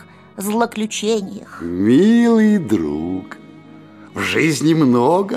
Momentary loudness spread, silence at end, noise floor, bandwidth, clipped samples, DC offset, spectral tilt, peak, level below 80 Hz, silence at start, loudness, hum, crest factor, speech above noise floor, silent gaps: 15 LU; 0 s; -41 dBFS; 15 kHz; under 0.1%; under 0.1%; -5.5 dB/octave; -2 dBFS; -50 dBFS; 0 s; -16 LUFS; none; 14 dB; 25 dB; none